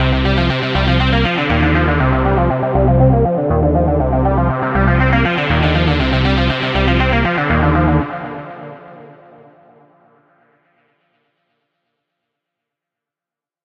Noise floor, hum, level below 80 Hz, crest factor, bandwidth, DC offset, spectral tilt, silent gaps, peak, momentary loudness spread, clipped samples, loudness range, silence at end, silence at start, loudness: -89 dBFS; none; -24 dBFS; 16 dB; 6.6 kHz; under 0.1%; -8 dB/octave; none; 0 dBFS; 3 LU; under 0.1%; 6 LU; 4.55 s; 0 s; -14 LUFS